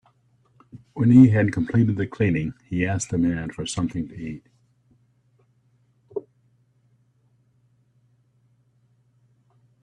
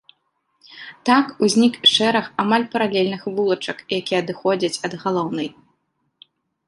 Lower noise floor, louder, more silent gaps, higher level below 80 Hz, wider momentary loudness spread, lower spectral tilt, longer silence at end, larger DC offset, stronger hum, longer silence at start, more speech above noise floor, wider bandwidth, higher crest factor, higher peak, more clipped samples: second, -64 dBFS vs -70 dBFS; about the same, -21 LUFS vs -19 LUFS; neither; first, -54 dBFS vs -66 dBFS; first, 22 LU vs 12 LU; first, -7 dB/octave vs -4 dB/octave; first, 3.6 s vs 1.15 s; neither; neither; about the same, 0.75 s vs 0.7 s; second, 43 dB vs 51 dB; about the same, 10.5 kHz vs 11.5 kHz; about the same, 22 dB vs 20 dB; about the same, -2 dBFS vs -2 dBFS; neither